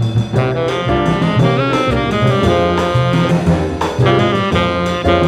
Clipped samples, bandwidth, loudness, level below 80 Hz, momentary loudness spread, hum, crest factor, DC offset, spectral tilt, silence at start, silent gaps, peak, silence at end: under 0.1%; 11 kHz; -14 LUFS; -30 dBFS; 3 LU; none; 14 dB; under 0.1%; -7 dB/octave; 0 s; none; 0 dBFS; 0 s